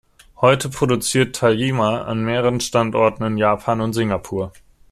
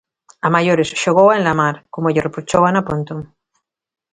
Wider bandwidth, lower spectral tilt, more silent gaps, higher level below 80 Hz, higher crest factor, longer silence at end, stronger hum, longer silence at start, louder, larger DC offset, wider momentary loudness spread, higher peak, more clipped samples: first, 14.5 kHz vs 9.6 kHz; about the same, -5 dB/octave vs -5.5 dB/octave; neither; about the same, -48 dBFS vs -50 dBFS; about the same, 18 dB vs 16 dB; second, 0.4 s vs 0.9 s; neither; about the same, 0.4 s vs 0.45 s; second, -19 LUFS vs -16 LUFS; neither; second, 6 LU vs 11 LU; about the same, -2 dBFS vs 0 dBFS; neither